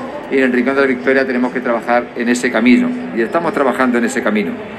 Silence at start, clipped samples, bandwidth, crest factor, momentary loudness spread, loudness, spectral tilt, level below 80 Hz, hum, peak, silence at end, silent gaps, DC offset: 0 s; under 0.1%; 12.5 kHz; 14 dB; 6 LU; -15 LUFS; -5 dB/octave; -54 dBFS; none; 0 dBFS; 0 s; none; under 0.1%